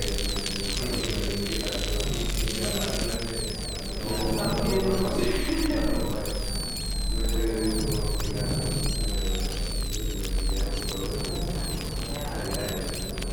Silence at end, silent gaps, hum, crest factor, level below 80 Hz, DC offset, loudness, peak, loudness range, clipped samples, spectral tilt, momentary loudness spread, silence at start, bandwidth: 0 s; none; none; 18 dB; -32 dBFS; under 0.1%; -29 LUFS; -8 dBFS; 3 LU; under 0.1%; -4 dB/octave; 5 LU; 0 s; over 20 kHz